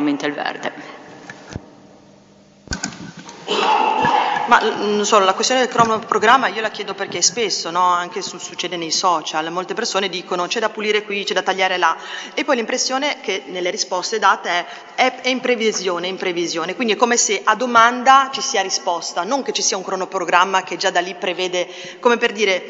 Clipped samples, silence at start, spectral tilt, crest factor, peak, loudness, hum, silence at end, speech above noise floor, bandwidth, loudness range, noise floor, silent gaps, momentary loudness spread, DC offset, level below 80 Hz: under 0.1%; 0 s; -2 dB/octave; 18 dB; 0 dBFS; -18 LUFS; none; 0 s; 30 dB; 8 kHz; 5 LU; -48 dBFS; none; 12 LU; under 0.1%; -56 dBFS